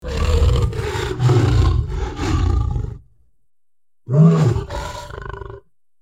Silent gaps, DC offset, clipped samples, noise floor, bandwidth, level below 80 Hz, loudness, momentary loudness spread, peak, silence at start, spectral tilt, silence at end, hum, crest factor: none; 0.2%; under 0.1%; under -90 dBFS; 13 kHz; -24 dBFS; -18 LUFS; 18 LU; -2 dBFS; 0.05 s; -7.5 dB/octave; 0.45 s; none; 16 dB